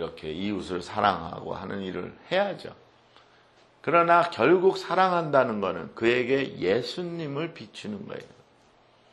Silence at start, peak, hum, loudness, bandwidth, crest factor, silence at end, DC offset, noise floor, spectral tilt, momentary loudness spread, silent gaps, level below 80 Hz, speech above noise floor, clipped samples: 0 s; -6 dBFS; none; -26 LUFS; 11.5 kHz; 22 dB; 0.85 s; under 0.1%; -60 dBFS; -6 dB/octave; 16 LU; none; -62 dBFS; 34 dB; under 0.1%